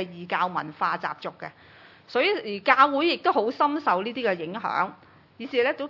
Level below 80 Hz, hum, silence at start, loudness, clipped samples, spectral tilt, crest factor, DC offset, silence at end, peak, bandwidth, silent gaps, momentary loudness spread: -76 dBFS; none; 0 s; -25 LUFS; under 0.1%; -6 dB/octave; 22 dB; under 0.1%; 0 s; -4 dBFS; 6 kHz; none; 14 LU